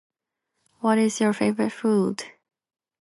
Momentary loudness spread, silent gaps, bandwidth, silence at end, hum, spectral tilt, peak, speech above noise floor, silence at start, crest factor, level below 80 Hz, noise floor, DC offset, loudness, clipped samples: 9 LU; none; 11.5 kHz; 0.7 s; none; -5.5 dB/octave; -8 dBFS; 58 dB; 0.85 s; 16 dB; -72 dBFS; -80 dBFS; under 0.1%; -23 LUFS; under 0.1%